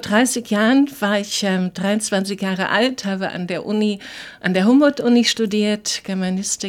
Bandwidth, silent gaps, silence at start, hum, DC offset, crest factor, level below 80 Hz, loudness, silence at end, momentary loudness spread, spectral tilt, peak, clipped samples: 16.5 kHz; none; 0 s; none; under 0.1%; 16 dB; -62 dBFS; -19 LUFS; 0 s; 9 LU; -4 dB/octave; -2 dBFS; under 0.1%